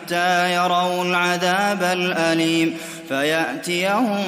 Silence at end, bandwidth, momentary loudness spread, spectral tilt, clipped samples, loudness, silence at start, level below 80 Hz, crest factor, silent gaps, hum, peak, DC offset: 0 s; 16 kHz; 4 LU; -4 dB/octave; under 0.1%; -19 LUFS; 0 s; -66 dBFS; 14 dB; none; none; -6 dBFS; under 0.1%